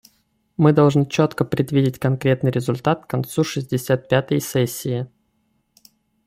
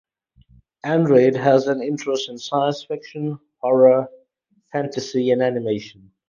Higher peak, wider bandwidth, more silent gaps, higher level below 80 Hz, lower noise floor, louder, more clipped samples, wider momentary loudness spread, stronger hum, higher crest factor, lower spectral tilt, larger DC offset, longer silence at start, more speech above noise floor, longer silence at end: about the same, -2 dBFS vs -2 dBFS; first, 16 kHz vs 7.2 kHz; neither; first, -56 dBFS vs -64 dBFS; about the same, -67 dBFS vs -65 dBFS; about the same, -20 LUFS vs -20 LUFS; neither; second, 9 LU vs 14 LU; neither; about the same, 18 dB vs 18 dB; about the same, -6.5 dB/octave vs -6.5 dB/octave; neither; second, 0.6 s vs 0.85 s; about the same, 48 dB vs 46 dB; first, 1.2 s vs 0.4 s